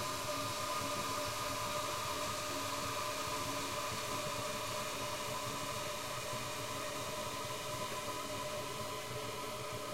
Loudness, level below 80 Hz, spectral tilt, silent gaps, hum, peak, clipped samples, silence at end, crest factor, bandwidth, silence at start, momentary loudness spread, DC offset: -39 LUFS; -62 dBFS; -2.5 dB/octave; none; none; -26 dBFS; under 0.1%; 0 s; 14 dB; 16 kHz; 0 s; 3 LU; 0.2%